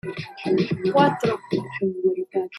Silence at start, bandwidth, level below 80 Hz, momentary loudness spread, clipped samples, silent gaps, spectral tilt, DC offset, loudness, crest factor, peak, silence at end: 0.05 s; 11.5 kHz; -62 dBFS; 9 LU; under 0.1%; none; -7 dB/octave; under 0.1%; -23 LUFS; 18 dB; -4 dBFS; 0 s